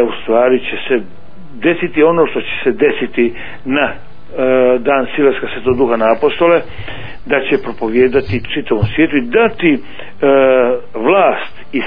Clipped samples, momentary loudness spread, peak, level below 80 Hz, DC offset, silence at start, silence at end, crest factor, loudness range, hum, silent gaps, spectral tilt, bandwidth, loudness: under 0.1%; 8 LU; 0 dBFS; -40 dBFS; 6%; 0 s; 0 s; 14 dB; 2 LU; none; none; -9.5 dB/octave; 5.2 kHz; -13 LUFS